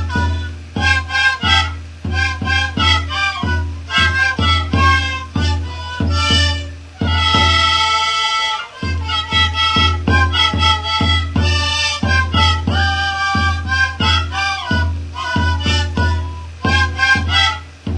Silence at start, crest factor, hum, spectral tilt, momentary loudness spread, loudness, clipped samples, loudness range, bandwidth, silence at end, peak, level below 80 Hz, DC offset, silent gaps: 0 s; 16 dB; none; -4 dB/octave; 10 LU; -15 LUFS; under 0.1%; 3 LU; 10.5 kHz; 0 s; 0 dBFS; -26 dBFS; under 0.1%; none